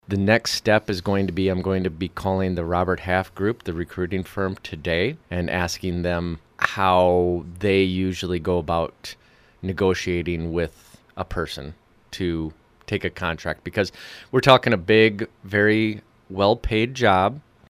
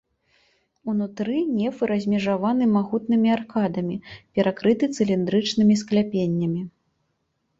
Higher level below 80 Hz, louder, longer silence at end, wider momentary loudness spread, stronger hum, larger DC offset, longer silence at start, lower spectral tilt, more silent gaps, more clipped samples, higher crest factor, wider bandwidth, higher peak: first, -44 dBFS vs -60 dBFS; about the same, -22 LUFS vs -23 LUFS; second, 0.3 s vs 0.9 s; first, 13 LU vs 9 LU; neither; neither; second, 0.1 s vs 0.85 s; about the same, -5.5 dB/octave vs -6.5 dB/octave; neither; neither; first, 22 dB vs 16 dB; first, 15.5 kHz vs 7.8 kHz; first, 0 dBFS vs -6 dBFS